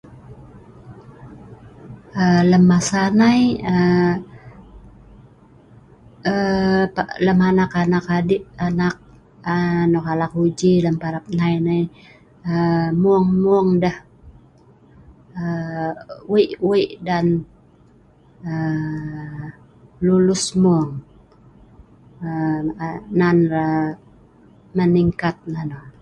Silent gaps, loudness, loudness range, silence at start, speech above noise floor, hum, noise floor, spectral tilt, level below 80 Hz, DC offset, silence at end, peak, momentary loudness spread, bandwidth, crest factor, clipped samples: none; -19 LUFS; 6 LU; 0.1 s; 33 dB; none; -51 dBFS; -6.5 dB/octave; -48 dBFS; under 0.1%; 0.1 s; -4 dBFS; 14 LU; 11 kHz; 16 dB; under 0.1%